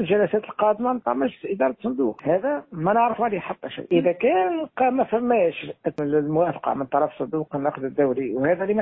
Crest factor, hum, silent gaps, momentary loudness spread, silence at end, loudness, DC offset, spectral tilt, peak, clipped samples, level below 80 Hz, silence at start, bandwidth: 16 dB; none; none; 7 LU; 0 s; -23 LUFS; under 0.1%; -10 dB/octave; -6 dBFS; under 0.1%; -62 dBFS; 0 s; 4 kHz